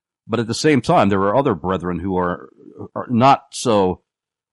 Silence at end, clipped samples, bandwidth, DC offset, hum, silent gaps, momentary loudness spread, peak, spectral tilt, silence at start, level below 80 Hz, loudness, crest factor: 0.55 s; under 0.1%; 11.5 kHz; under 0.1%; none; none; 16 LU; -2 dBFS; -6 dB/octave; 0.3 s; -50 dBFS; -18 LUFS; 16 dB